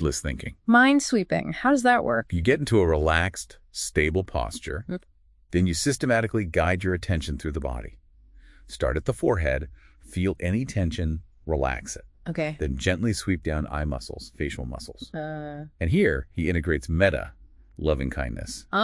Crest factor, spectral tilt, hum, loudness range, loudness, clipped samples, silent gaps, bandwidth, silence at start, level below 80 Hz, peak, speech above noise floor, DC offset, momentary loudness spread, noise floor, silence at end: 22 dB; -5.5 dB/octave; none; 7 LU; -25 LUFS; under 0.1%; none; 12 kHz; 0 s; -38 dBFS; -4 dBFS; 27 dB; under 0.1%; 14 LU; -52 dBFS; 0 s